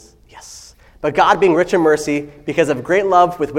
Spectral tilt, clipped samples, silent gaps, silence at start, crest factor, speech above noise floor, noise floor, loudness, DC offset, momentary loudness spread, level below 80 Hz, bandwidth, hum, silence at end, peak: -5 dB/octave; under 0.1%; none; 0.35 s; 16 dB; 27 dB; -41 dBFS; -15 LUFS; under 0.1%; 15 LU; -48 dBFS; 15.5 kHz; none; 0 s; 0 dBFS